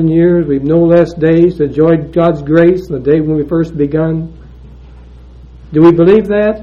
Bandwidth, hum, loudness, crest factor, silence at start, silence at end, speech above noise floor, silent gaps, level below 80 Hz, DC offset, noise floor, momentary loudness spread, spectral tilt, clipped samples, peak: 5.8 kHz; none; -10 LUFS; 10 dB; 0 s; 0 s; 25 dB; none; -34 dBFS; under 0.1%; -34 dBFS; 7 LU; -10 dB/octave; 0.6%; 0 dBFS